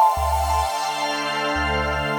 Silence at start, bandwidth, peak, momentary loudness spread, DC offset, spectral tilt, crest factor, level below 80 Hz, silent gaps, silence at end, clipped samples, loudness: 0 s; over 20 kHz; -6 dBFS; 3 LU; under 0.1%; -4 dB/octave; 16 dB; -32 dBFS; none; 0 s; under 0.1%; -22 LUFS